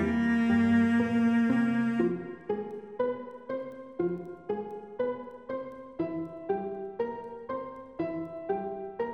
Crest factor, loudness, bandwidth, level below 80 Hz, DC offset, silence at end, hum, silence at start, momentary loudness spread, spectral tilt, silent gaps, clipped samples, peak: 14 dB; -31 LUFS; 8.2 kHz; -60 dBFS; under 0.1%; 0 s; none; 0 s; 14 LU; -8 dB/octave; none; under 0.1%; -16 dBFS